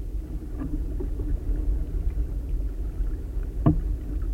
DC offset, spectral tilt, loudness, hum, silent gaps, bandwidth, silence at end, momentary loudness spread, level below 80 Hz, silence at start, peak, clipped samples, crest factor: under 0.1%; -9.5 dB/octave; -30 LUFS; none; none; 3.1 kHz; 0 s; 9 LU; -28 dBFS; 0 s; -6 dBFS; under 0.1%; 20 dB